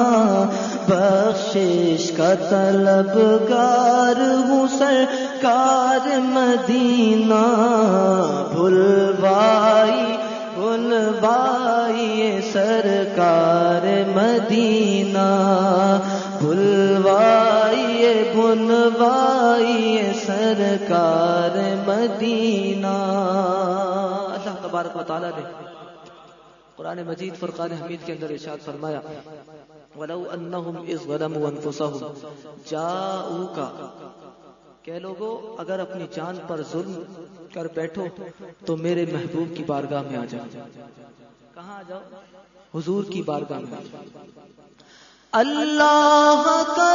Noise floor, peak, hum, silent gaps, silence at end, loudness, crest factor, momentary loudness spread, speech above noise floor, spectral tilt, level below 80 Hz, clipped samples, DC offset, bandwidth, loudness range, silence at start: -51 dBFS; -4 dBFS; none; none; 0 s; -18 LUFS; 16 dB; 17 LU; 32 dB; -5.5 dB/octave; -66 dBFS; under 0.1%; under 0.1%; 7.4 kHz; 16 LU; 0 s